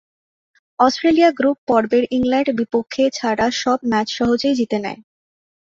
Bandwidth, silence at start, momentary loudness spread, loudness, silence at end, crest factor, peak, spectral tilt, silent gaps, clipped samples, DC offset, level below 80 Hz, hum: 7.8 kHz; 0.8 s; 7 LU; -18 LUFS; 0.8 s; 16 dB; -2 dBFS; -4.5 dB/octave; 1.58-1.67 s; under 0.1%; under 0.1%; -52 dBFS; none